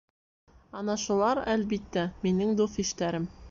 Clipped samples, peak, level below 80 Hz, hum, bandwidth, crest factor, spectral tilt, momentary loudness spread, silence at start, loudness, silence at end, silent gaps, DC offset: under 0.1%; -14 dBFS; -54 dBFS; none; 7.6 kHz; 16 dB; -5 dB/octave; 7 LU; 0.75 s; -29 LUFS; 0 s; none; under 0.1%